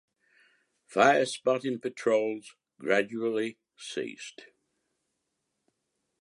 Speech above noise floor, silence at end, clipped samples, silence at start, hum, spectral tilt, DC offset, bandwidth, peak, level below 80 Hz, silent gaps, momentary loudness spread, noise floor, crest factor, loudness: 53 dB; 1.9 s; under 0.1%; 0.9 s; none; -4 dB/octave; under 0.1%; 11.5 kHz; -6 dBFS; -82 dBFS; none; 17 LU; -81 dBFS; 26 dB; -28 LUFS